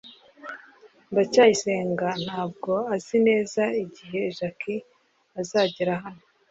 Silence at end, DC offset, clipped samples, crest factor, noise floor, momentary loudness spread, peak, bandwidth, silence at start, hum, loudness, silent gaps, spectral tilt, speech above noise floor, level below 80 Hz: 0.35 s; under 0.1%; under 0.1%; 20 dB; -54 dBFS; 21 LU; -6 dBFS; 8 kHz; 0.05 s; none; -25 LUFS; none; -4.5 dB/octave; 30 dB; -68 dBFS